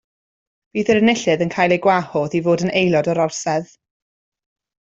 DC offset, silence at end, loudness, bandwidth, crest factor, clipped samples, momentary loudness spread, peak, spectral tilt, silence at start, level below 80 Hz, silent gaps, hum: under 0.1%; 1.2 s; -18 LUFS; 8 kHz; 16 dB; under 0.1%; 8 LU; -2 dBFS; -5 dB/octave; 0.75 s; -58 dBFS; none; none